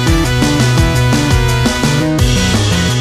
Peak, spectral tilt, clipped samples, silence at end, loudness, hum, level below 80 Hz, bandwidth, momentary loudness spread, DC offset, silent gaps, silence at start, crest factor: 0 dBFS; -5 dB/octave; under 0.1%; 0 s; -12 LUFS; none; -20 dBFS; 15.5 kHz; 2 LU; under 0.1%; none; 0 s; 12 dB